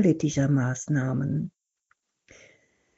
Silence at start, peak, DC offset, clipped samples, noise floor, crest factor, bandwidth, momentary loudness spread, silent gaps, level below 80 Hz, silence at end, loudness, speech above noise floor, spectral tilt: 0 s; -10 dBFS; under 0.1%; under 0.1%; -72 dBFS; 18 dB; 8 kHz; 7 LU; none; -60 dBFS; 1.5 s; -26 LUFS; 48 dB; -8 dB/octave